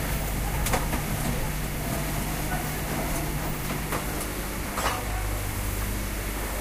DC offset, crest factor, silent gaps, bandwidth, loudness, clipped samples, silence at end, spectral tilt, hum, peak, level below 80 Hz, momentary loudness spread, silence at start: under 0.1%; 18 dB; none; 16 kHz; -29 LUFS; under 0.1%; 0 s; -4 dB/octave; none; -12 dBFS; -32 dBFS; 4 LU; 0 s